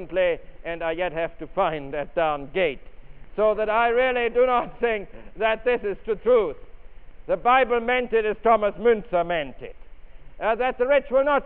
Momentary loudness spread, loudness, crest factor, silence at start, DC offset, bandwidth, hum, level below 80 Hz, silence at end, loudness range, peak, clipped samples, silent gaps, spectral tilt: 10 LU; -23 LUFS; 18 dB; 0 s; under 0.1%; 4.1 kHz; none; -44 dBFS; 0 s; 3 LU; -6 dBFS; under 0.1%; none; -2.5 dB/octave